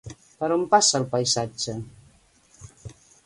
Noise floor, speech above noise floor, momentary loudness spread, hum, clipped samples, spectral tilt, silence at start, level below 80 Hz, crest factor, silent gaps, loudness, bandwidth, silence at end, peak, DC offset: -58 dBFS; 35 dB; 26 LU; none; under 0.1%; -3 dB/octave; 0.05 s; -58 dBFS; 22 dB; none; -22 LUFS; 11.5 kHz; 0.35 s; -4 dBFS; under 0.1%